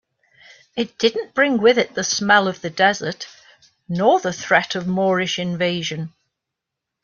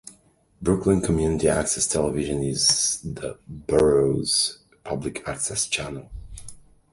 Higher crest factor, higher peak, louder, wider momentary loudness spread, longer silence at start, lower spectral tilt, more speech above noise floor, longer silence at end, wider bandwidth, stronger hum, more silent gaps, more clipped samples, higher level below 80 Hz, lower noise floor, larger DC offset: about the same, 18 dB vs 20 dB; about the same, -2 dBFS vs -4 dBFS; first, -19 LUFS vs -22 LUFS; second, 13 LU vs 18 LU; first, 0.75 s vs 0.05 s; about the same, -4 dB/octave vs -3.5 dB/octave; first, 64 dB vs 34 dB; first, 0.95 s vs 0.4 s; second, 7.4 kHz vs 11.5 kHz; neither; neither; neither; second, -62 dBFS vs -42 dBFS; first, -83 dBFS vs -57 dBFS; neither